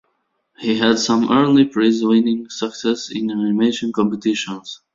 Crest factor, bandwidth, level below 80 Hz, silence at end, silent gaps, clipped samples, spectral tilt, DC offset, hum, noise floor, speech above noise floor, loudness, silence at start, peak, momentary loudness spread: 16 dB; 7.8 kHz; -60 dBFS; 0.2 s; none; under 0.1%; -5 dB/octave; under 0.1%; none; -69 dBFS; 52 dB; -18 LUFS; 0.6 s; -2 dBFS; 9 LU